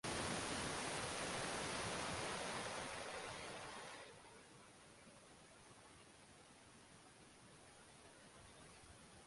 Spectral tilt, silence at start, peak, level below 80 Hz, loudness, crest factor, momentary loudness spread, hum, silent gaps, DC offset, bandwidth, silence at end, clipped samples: -2.5 dB/octave; 0.05 s; -30 dBFS; -68 dBFS; -45 LUFS; 20 dB; 19 LU; none; none; under 0.1%; 11.5 kHz; 0 s; under 0.1%